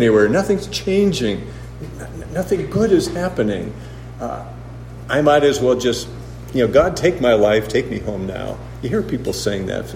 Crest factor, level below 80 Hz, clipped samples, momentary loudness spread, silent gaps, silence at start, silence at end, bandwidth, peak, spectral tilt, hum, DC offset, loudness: 18 dB; -38 dBFS; under 0.1%; 18 LU; none; 0 s; 0 s; 16 kHz; 0 dBFS; -5.5 dB/octave; none; under 0.1%; -18 LUFS